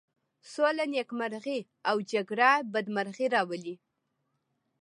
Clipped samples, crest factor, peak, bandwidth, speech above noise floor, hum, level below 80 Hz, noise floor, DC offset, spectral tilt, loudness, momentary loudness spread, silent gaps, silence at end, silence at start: under 0.1%; 22 dB; -8 dBFS; 11 kHz; 50 dB; none; -86 dBFS; -80 dBFS; under 0.1%; -4.5 dB/octave; -29 LUFS; 13 LU; none; 1.05 s; 0.45 s